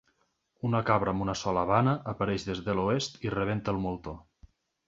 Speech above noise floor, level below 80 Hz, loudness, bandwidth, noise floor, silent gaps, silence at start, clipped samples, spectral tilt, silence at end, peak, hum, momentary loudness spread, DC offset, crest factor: 45 dB; -52 dBFS; -29 LUFS; 8 kHz; -74 dBFS; none; 0.65 s; under 0.1%; -6 dB/octave; 0.65 s; -8 dBFS; none; 10 LU; under 0.1%; 22 dB